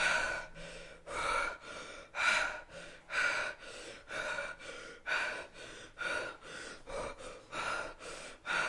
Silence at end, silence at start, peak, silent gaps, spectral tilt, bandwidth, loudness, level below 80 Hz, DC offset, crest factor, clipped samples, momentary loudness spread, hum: 0 s; 0 s; -16 dBFS; none; -1 dB/octave; 11.5 kHz; -37 LUFS; -58 dBFS; under 0.1%; 22 dB; under 0.1%; 16 LU; none